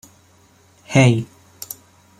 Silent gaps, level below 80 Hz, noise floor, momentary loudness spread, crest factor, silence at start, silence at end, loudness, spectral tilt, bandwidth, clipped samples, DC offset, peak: none; -56 dBFS; -53 dBFS; 22 LU; 20 dB; 0.9 s; 0.95 s; -17 LUFS; -6 dB/octave; 16 kHz; under 0.1%; under 0.1%; -2 dBFS